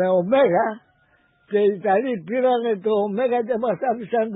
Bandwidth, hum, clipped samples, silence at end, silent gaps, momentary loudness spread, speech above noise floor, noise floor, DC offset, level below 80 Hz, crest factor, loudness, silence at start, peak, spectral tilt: 4 kHz; none; under 0.1%; 0 s; none; 7 LU; 41 dB; -61 dBFS; under 0.1%; -68 dBFS; 14 dB; -21 LUFS; 0 s; -6 dBFS; -11 dB/octave